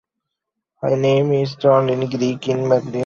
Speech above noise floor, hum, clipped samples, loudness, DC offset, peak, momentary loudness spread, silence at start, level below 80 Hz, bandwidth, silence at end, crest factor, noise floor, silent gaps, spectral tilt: 63 dB; none; under 0.1%; -18 LUFS; under 0.1%; -2 dBFS; 6 LU; 0.8 s; -58 dBFS; 7.2 kHz; 0 s; 16 dB; -81 dBFS; none; -7 dB/octave